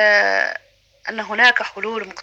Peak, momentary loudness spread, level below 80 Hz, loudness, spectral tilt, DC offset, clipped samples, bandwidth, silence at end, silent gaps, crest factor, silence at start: 0 dBFS; 16 LU; -64 dBFS; -17 LUFS; -2 dB/octave; under 0.1%; under 0.1%; 8.4 kHz; 0 s; none; 18 dB; 0 s